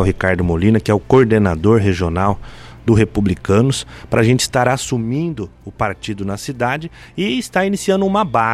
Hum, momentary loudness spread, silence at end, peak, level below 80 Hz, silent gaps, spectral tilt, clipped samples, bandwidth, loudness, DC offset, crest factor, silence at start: none; 10 LU; 0 s; -2 dBFS; -36 dBFS; none; -6 dB/octave; under 0.1%; 14.5 kHz; -16 LUFS; under 0.1%; 14 dB; 0 s